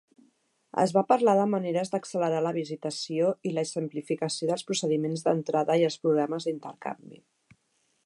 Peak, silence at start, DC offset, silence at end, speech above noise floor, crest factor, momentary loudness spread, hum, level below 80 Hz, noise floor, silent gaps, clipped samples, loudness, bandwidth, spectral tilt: -8 dBFS; 0.75 s; under 0.1%; 0.9 s; 45 dB; 20 dB; 11 LU; none; -80 dBFS; -73 dBFS; none; under 0.1%; -27 LUFS; 11.5 kHz; -5.5 dB/octave